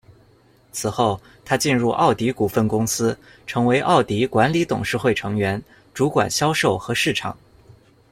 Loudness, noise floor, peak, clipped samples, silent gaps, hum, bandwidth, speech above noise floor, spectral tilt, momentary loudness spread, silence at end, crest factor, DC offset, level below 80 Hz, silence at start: -20 LUFS; -55 dBFS; -2 dBFS; under 0.1%; none; none; 16.5 kHz; 35 dB; -4.5 dB/octave; 10 LU; 0.8 s; 18 dB; under 0.1%; -52 dBFS; 0.75 s